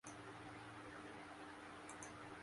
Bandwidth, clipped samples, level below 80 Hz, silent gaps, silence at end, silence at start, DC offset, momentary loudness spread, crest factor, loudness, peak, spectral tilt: 11.5 kHz; under 0.1%; -76 dBFS; none; 0 s; 0.05 s; under 0.1%; 1 LU; 16 dB; -55 LUFS; -38 dBFS; -4 dB/octave